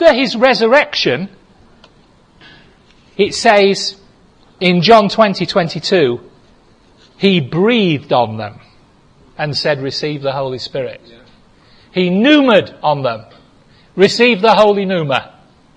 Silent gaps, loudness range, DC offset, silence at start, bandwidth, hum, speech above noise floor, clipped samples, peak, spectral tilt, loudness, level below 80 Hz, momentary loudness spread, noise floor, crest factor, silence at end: none; 7 LU; under 0.1%; 0 s; 10.5 kHz; none; 36 dB; 0.1%; 0 dBFS; -5 dB/octave; -13 LUFS; -52 dBFS; 13 LU; -48 dBFS; 14 dB; 0.5 s